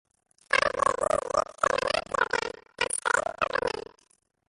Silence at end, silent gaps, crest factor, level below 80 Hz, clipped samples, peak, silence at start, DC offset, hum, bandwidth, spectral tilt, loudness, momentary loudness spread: 0.65 s; none; 22 dB; -56 dBFS; under 0.1%; -8 dBFS; 0.5 s; under 0.1%; none; 11.5 kHz; -1.5 dB/octave; -27 LUFS; 6 LU